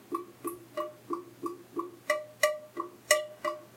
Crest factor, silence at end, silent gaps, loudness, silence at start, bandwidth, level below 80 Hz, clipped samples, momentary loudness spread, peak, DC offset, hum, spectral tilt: 30 dB; 0 s; none; -34 LUFS; 0 s; 16.5 kHz; -82 dBFS; under 0.1%; 13 LU; -6 dBFS; under 0.1%; none; -1.5 dB/octave